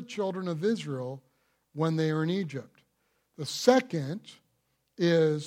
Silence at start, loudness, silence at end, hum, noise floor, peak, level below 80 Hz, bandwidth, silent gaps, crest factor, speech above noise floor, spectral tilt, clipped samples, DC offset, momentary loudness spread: 0 s; -29 LUFS; 0 s; none; -75 dBFS; -6 dBFS; -78 dBFS; 15.5 kHz; none; 24 dB; 47 dB; -6 dB/octave; under 0.1%; under 0.1%; 16 LU